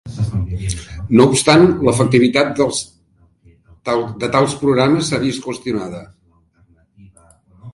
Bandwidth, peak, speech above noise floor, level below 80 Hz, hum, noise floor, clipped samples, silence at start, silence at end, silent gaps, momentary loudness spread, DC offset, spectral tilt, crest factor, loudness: 11.5 kHz; 0 dBFS; 41 dB; -38 dBFS; none; -55 dBFS; under 0.1%; 0.05 s; 0.05 s; none; 14 LU; under 0.1%; -5.5 dB/octave; 16 dB; -16 LUFS